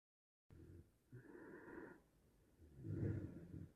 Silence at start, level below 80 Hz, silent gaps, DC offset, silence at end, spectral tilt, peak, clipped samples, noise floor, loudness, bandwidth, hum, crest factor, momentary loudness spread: 0.5 s; -70 dBFS; none; under 0.1%; 0 s; -9.5 dB/octave; -34 dBFS; under 0.1%; -75 dBFS; -52 LUFS; 13 kHz; none; 20 dB; 20 LU